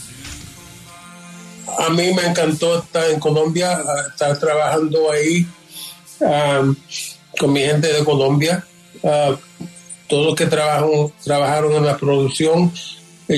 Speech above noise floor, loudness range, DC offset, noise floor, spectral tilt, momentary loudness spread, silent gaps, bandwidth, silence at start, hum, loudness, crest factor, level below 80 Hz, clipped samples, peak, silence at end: 23 dB; 1 LU; under 0.1%; -39 dBFS; -5 dB/octave; 19 LU; none; 13.5 kHz; 0 s; none; -17 LUFS; 14 dB; -54 dBFS; under 0.1%; -4 dBFS; 0 s